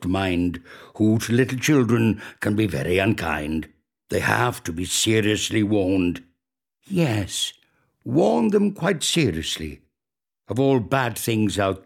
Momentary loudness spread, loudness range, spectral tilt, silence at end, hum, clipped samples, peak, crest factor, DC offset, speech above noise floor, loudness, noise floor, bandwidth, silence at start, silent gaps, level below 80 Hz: 9 LU; 2 LU; -5 dB/octave; 0.05 s; none; under 0.1%; 0 dBFS; 22 dB; under 0.1%; over 69 dB; -22 LUFS; under -90 dBFS; 17 kHz; 0 s; none; -48 dBFS